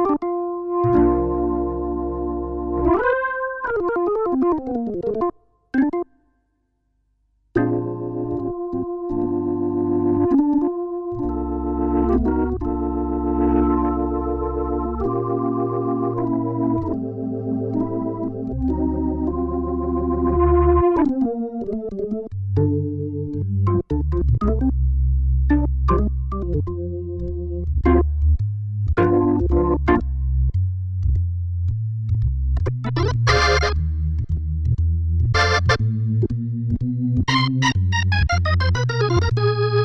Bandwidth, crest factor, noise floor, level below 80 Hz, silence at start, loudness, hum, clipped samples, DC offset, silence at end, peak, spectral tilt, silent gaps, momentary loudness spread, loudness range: 7.2 kHz; 16 dB; -68 dBFS; -26 dBFS; 0 s; -21 LUFS; none; under 0.1%; under 0.1%; 0 s; -4 dBFS; -7.5 dB/octave; none; 8 LU; 4 LU